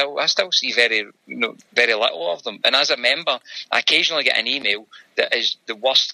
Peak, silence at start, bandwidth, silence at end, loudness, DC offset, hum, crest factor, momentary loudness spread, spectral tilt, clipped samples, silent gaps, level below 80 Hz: 0 dBFS; 0 s; 13 kHz; 0 s; -18 LUFS; under 0.1%; none; 20 dB; 9 LU; -0.5 dB/octave; under 0.1%; none; -72 dBFS